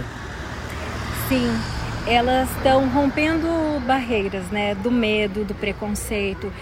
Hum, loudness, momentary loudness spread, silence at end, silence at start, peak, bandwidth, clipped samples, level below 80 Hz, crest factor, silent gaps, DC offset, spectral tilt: none; -22 LUFS; 11 LU; 0 s; 0 s; -4 dBFS; 16 kHz; under 0.1%; -36 dBFS; 18 dB; none; under 0.1%; -5 dB/octave